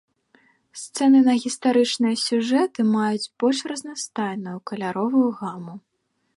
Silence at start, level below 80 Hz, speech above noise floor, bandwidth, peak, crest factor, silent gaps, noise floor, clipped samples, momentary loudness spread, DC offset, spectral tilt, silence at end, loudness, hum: 0.75 s; -74 dBFS; 51 dB; 11.5 kHz; -8 dBFS; 14 dB; none; -73 dBFS; under 0.1%; 15 LU; under 0.1%; -4.5 dB/octave; 0.55 s; -22 LUFS; none